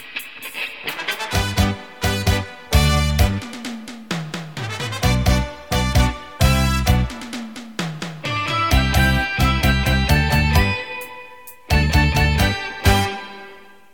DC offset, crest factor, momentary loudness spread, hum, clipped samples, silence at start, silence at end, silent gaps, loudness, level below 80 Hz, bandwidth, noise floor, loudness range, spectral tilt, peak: 0.5%; 18 dB; 14 LU; none; under 0.1%; 0 s; 0.35 s; none; -19 LUFS; -24 dBFS; 17.5 kHz; -43 dBFS; 3 LU; -5 dB/octave; -2 dBFS